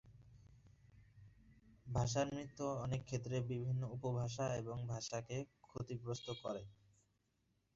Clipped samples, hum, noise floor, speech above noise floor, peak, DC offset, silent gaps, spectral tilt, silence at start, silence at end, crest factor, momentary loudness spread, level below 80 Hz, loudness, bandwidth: under 0.1%; none; -81 dBFS; 39 dB; -26 dBFS; under 0.1%; none; -6.5 dB/octave; 0.05 s; 1 s; 18 dB; 8 LU; -64 dBFS; -43 LUFS; 7.6 kHz